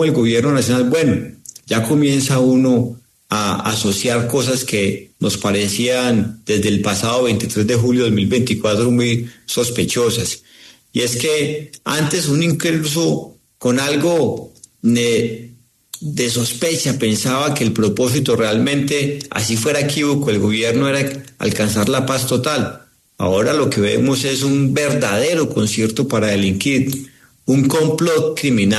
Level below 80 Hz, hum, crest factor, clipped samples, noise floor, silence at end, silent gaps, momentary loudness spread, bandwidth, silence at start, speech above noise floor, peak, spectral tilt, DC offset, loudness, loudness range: -50 dBFS; none; 14 dB; under 0.1%; -38 dBFS; 0 s; none; 7 LU; 13.5 kHz; 0 s; 22 dB; -4 dBFS; -4.5 dB/octave; under 0.1%; -17 LUFS; 2 LU